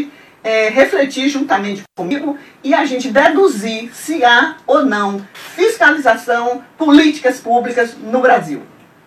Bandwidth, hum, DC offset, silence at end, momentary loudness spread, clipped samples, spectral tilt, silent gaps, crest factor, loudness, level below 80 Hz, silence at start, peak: 14 kHz; none; under 0.1%; 0.4 s; 14 LU; under 0.1%; -4 dB/octave; none; 14 dB; -14 LUFS; -58 dBFS; 0 s; 0 dBFS